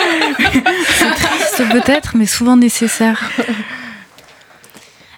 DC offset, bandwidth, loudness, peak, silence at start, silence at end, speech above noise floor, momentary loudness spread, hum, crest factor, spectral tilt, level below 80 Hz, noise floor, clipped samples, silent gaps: under 0.1%; 18 kHz; -12 LUFS; 0 dBFS; 0 s; 1.15 s; 30 dB; 10 LU; none; 14 dB; -3 dB/octave; -40 dBFS; -43 dBFS; under 0.1%; none